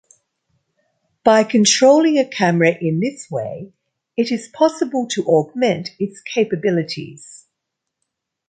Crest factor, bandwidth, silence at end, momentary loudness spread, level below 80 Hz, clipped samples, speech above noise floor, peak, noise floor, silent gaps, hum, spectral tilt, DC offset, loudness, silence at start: 16 dB; 9.4 kHz; 1.1 s; 15 LU; -64 dBFS; under 0.1%; 62 dB; -2 dBFS; -79 dBFS; none; none; -4.5 dB/octave; under 0.1%; -17 LUFS; 1.25 s